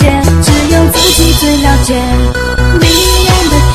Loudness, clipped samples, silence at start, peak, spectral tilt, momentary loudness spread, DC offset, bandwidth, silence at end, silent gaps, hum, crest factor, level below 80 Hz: -8 LUFS; 1%; 0 s; 0 dBFS; -4.5 dB/octave; 5 LU; 2%; 15.5 kHz; 0 s; none; none; 8 dB; -12 dBFS